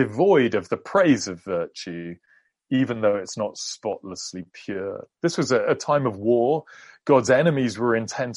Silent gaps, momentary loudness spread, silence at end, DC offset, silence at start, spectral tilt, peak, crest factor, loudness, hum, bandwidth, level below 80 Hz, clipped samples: none; 15 LU; 0 s; under 0.1%; 0 s; -5.5 dB/octave; -4 dBFS; 18 dB; -23 LUFS; none; 11.5 kHz; -66 dBFS; under 0.1%